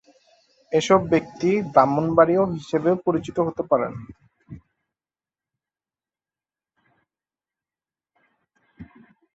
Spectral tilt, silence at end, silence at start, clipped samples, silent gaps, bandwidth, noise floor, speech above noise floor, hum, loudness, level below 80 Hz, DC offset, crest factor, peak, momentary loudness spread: -6.5 dB/octave; 0.5 s; 0.7 s; under 0.1%; none; 8.2 kHz; under -90 dBFS; over 70 dB; none; -21 LUFS; -58 dBFS; under 0.1%; 22 dB; -2 dBFS; 7 LU